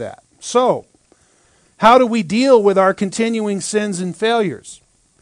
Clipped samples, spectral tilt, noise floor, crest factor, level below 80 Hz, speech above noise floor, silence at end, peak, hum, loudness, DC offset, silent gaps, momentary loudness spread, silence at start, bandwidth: 0.1%; -4.5 dB/octave; -55 dBFS; 16 dB; -58 dBFS; 40 dB; 0.45 s; 0 dBFS; none; -15 LUFS; under 0.1%; none; 12 LU; 0 s; 10.5 kHz